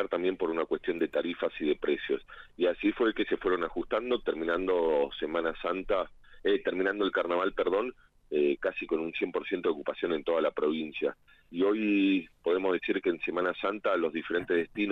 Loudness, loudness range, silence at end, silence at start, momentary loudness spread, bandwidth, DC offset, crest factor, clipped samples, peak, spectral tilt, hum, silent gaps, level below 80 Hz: -30 LUFS; 2 LU; 0 s; 0 s; 5 LU; 5.8 kHz; under 0.1%; 14 dB; under 0.1%; -16 dBFS; -7 dB/octave; none; none; -56 dBFS